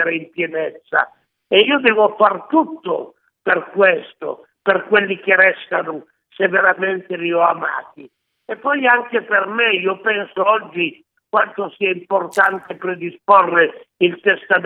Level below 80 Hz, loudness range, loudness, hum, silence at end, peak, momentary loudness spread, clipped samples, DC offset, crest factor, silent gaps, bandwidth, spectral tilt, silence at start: -72 dBFS; 2 LU; -17 LUFS; none; 0 s; 0 dBFS; 12 LU; under 0.1%; under 0.1%; 18 dB; none; 11.5 kHz; -5.5 dB/octave; 0 s